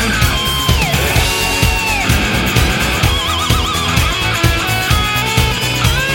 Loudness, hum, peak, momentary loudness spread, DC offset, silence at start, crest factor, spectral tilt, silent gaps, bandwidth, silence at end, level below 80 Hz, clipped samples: -13 LUFS; none; 0 dBFS; 1 LU; under 0.1%; 0 s; 14 dB; -3.5 dB/octave; none; 17 kHz; 0 s; -22 dBFS; under 0.1%